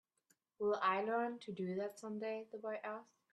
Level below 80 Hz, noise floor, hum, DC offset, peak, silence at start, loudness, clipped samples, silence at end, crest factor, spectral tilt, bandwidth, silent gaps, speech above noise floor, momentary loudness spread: -88 dBFS; -80 dBFS; none; under 0.1%; -22 dBFS; 0.6 s; -41 LUFS; under 0.1%; 0.3 s; 20 dB; -6 dB/octave; 12.5 kHz; none; 39 dB; 10 LU